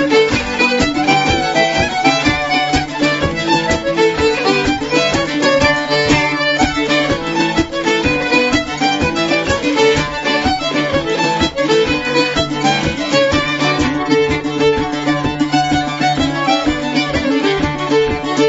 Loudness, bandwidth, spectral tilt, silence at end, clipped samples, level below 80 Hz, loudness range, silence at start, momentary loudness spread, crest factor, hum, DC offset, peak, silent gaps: -14 LUFS; 8 kHz; -4.5 dB/octave; 0 s; under 0.1%; -34 dBFS; 2 LU; 0 s; 3 LU; 14 dB; none; under 0.1%; 0 dBFS; none